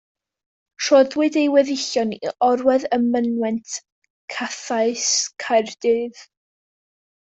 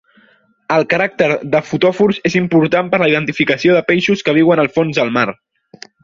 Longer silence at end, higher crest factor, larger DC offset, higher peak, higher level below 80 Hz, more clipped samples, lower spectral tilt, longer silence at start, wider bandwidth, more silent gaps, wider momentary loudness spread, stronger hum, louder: first, 0.95 s vs 0.7 s; about the same, 18 dB vs 14 dB; neither; second, -4 dBFS vs 0 dBFS; second, -68 dBFS vs -54 dBFS; neither; second, -2.5 dB/octave vs -6 dB/octave; about the same, 0.8 s vs 0.7 s; first, 8.2 kHz vs 7.4 kHz; first, 3.92-4.02 s, 4.10-4.28 s vs none; first, 11 LU vs 4 LU; neither; second, -20 LUFS vs -14 LUFS